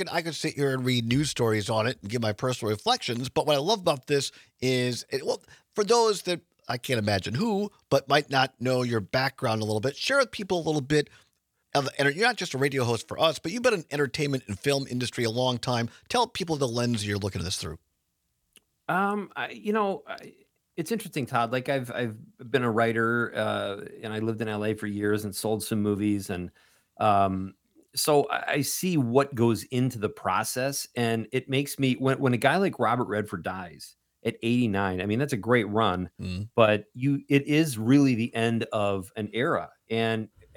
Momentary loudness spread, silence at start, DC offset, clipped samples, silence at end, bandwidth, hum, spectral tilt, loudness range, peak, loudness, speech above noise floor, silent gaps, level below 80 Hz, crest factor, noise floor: 10 LU; 0 s; under 0.1%; under 0.1%; 0.3 s; 19 kHz; none; -5 dB/octave; 4 LU; -4 dBFS; -27 LUFS; 50 dB; none; -64 dBFS; 24 dB; -77 dBFS